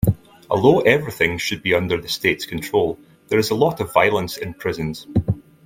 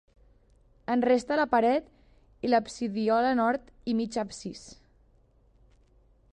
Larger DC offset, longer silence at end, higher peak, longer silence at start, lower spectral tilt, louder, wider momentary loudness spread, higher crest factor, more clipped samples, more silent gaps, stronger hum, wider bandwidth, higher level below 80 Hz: neither; second, 0.25 s vs 1.6 s; first, 0 dBFS vs -12 dBFS; second, 0 s vs 0.9 s; about the same, -5.5 dB/octave vs -5 dB/octave; first, -20 LUFS vs -27 LUFS; second, 10 LU vs 14 LU; about the same, 20 dB vs 18 dB; neither; neither; neither; first, 16.5 kHz vs 9.8 kHz; first, -44 dBFS vs -60 dBFS